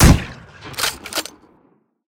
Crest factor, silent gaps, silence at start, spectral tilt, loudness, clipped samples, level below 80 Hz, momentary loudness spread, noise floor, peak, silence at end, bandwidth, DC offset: 18 dB; none; 0 s; -4.5 dB/octave; -20 LUFS; under 0.1%; -24 dBFS; 19 LU; -58 dBFS; 0 dBFS; 0.9 s; 18 kHz; under 0.1%